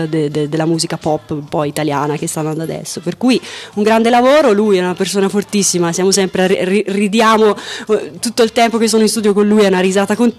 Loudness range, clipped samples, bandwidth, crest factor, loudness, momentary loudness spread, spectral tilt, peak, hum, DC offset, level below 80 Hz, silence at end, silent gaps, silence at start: 5 LU; under 0.1%; 14.5 kHz; 12 dB; -14 LUFS; 9 LU; -4.5 dB/octave; -2 dBFS; none; under 0.1%; -54 dBFS; 0.05 s; none; 0 s